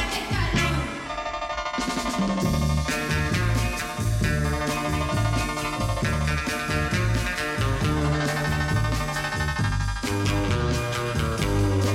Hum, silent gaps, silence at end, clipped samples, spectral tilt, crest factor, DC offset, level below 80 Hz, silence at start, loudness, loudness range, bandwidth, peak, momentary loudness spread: none; none; 0 s; under 0.1%; -5 dB/octave; 14 dB; under 0.1%; -32 dBFS; 0 s; -25 LUFS; 1 LU; 16.5 kHz; -10 dBFS; 3 LU